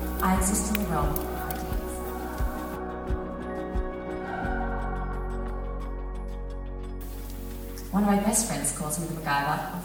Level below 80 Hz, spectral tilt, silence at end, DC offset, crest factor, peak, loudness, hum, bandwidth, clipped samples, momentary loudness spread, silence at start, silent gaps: -34 dBFS; -4.5 dB/octave; 0 s; under 0.1%; 22 dB; -6 dBFS; -30 LUFS; none; over 20 kHz; under 0.1%; 14 LU; 0 s; none